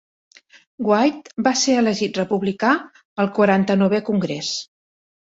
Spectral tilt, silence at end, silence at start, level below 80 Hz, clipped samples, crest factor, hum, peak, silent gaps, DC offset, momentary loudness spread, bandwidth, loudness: -4.5 dB/octave; 0.75 s; 0.8 s; -62 dBFS; under 0.1%; 16 dB; none; -4 dBFS; 3.05-3.16 s; under 0.1%; 8 LU; 8 kHz; -20 LUFS